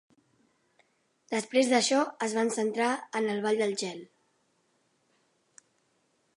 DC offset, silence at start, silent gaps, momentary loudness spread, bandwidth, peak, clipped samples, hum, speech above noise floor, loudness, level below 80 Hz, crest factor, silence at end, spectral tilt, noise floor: under 0.1%; 1.3 s; none; 10 LU; 11.5 kHz; -12 dBFS; under 0.1%; none; 44 dB; -28 LUFS; -84 dBFS; 20 dB; 2.3 s; -3 dB/octave; -73 dBFS